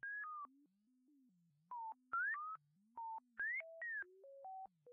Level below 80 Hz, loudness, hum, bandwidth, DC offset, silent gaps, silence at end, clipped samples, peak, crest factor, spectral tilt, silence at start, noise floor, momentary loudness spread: under -90 dBFS; -47 LUFS; none; 3.2 kHz; under 0.1%; none; 0 s; under 0.1%; -36 dBFS; 14 dB; 7 dB/octave; 0.05 s; -77 dBFS; 14 LU